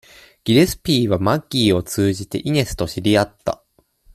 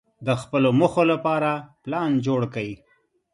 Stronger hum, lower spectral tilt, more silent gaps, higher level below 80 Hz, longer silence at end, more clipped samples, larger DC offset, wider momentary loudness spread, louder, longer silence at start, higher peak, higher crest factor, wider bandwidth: neither; second, -5.5 dB/octave vs -7 dB/octave; neither; first, -42 dBFS vs -60 dBFS; about the same, 0.6 s vs 0.6 s; neither; neither; about the same, 10 LU vs 12 LU; first, -19 LUFS vs -23 LUFS; first, 0.45 s vs 0.2 s; about the same, -2 dBFS vs -4 dBFS; about the same, 16 dB vs 18 dB; first, 15 kHz vs 11.5 kHz